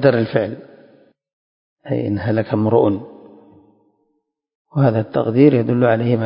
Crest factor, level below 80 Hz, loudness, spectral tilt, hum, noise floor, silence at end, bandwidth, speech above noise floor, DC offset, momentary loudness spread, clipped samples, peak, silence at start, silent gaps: 18 dB; -52 dBFS; -17 LUFS; -13 dB/octave; none; -70 dBFS; 0 s; 5.4 kHz; 54 dB; under 0.1%; 13 LU; under 0.1%; 0 dBFS; 0 s; 1.33-1.77 s, 4.55-4.65 s